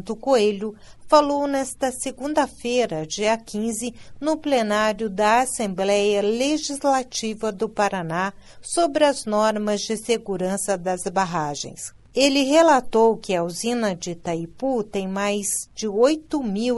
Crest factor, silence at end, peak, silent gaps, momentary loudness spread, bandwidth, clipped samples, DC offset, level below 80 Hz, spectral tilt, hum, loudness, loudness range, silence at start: 20 dB; 0 s; -2 dBFS; none; 10 LU; 12 kHz; under 0.1%; under 0.1%; -52 dBFS; -3.5 dB/octave; none; -22 LUFS; 3 LU; 0 s